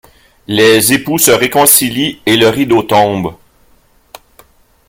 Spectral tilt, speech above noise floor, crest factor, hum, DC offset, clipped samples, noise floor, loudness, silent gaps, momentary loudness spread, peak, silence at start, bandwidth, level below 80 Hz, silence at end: -3 dB/octave; 39 dB; 12 dB; none; under 0.1%; 0.2%; -49 dBFS; -9 LUFS; none; 8 LU; 0 dBFS; 0.5 s; over 20 kHz; -46 dBFS; 1.55 s